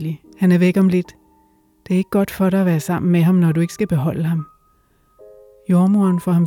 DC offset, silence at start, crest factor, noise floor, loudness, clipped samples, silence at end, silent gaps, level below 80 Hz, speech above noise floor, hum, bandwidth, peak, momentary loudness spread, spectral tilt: under 0.1%; 0 s; 12 dB; -58 dBFS; -17 LUFS; under 0.1%; 0 s; none; -54 dBFS; 42 dB; none; 16.5 kHz; -4 dBFS; 9 LU; -8 dB/octave